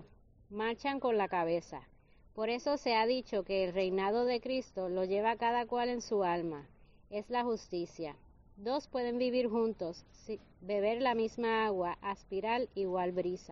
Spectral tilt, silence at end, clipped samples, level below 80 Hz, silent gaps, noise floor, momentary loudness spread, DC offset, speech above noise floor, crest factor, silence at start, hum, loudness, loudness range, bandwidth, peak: -3.5 dB/octave; 0 s; under 0.1%; -64 dBFS; none; -60 dBFS; 12 LU; under 0.1%; 26 dB; 16 dB; 0 s; none; -35 LUFS; 4 LU; 7.4 kHz; -20 dBFS